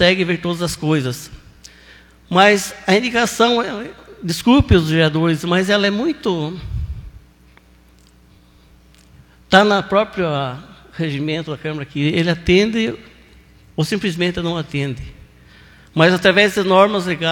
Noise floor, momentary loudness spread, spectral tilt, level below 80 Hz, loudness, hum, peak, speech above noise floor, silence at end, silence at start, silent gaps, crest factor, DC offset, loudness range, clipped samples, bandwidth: -49 dBFS; 15 LU; -5 dB/octave; -38 dBFS; -17 LUFS; none; 0 dBFS; 33 dB; 0 s; 0 s; none; 18 dB; under 0.1%; 7 LU; under 0.1%; 18 kHz